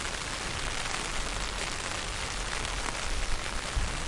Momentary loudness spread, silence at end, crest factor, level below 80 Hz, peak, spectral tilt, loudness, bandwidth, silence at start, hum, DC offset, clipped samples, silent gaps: 1 LU; 0 s; 20 dB; -36 dBFS; -12 dBFS; -2 dB/octave; -33 LUFS; 11.5 kHz; 0 s; none; under 0.1%; under 0.1%; none